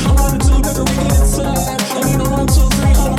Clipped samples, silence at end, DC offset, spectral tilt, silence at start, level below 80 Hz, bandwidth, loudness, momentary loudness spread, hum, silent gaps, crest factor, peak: under 0.1%; 0 s; under 0.1%; -5 dB/octave; 0 s; -14 dBFS; 16.5 kHz; -14 LUFS; 4 LU; none; none; 12 dB; -2 dBFS